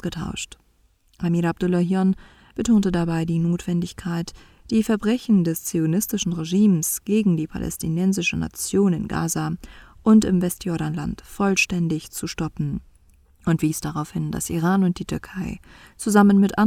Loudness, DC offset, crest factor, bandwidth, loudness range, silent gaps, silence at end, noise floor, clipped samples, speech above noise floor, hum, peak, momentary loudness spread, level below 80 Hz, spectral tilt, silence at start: -22 LUFS; under 0.1%; 20 dB; 16 kHz; 4 LU; none; 0 s; -61 dBFS; under 0.1%; 39 dB; none; -2 dBFS; 12 LU; -46 dBFS; -5.5 dB/octave; 0.05 s